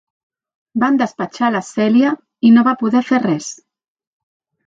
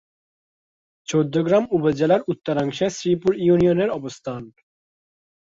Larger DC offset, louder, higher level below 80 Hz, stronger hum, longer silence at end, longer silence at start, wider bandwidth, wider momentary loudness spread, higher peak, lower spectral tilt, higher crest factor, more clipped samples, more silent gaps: neither; first, -15 LUFS vs -21 LUFS; second, -66 dBFS vs -56 dBFS; neither; first, 1.15 s vs 0.95 s; second, 0.75 s vs 1.1 s; about the same, 7.8 kHz vs 7.8 kHz; second, 10 LU vs 14 LU; first, -2 dBFS vs -6 dBFS; about the same, -5.5 dB/octave vs -6.5 dB/octave; about the same, 14 dB vs 16 dB; neither; neither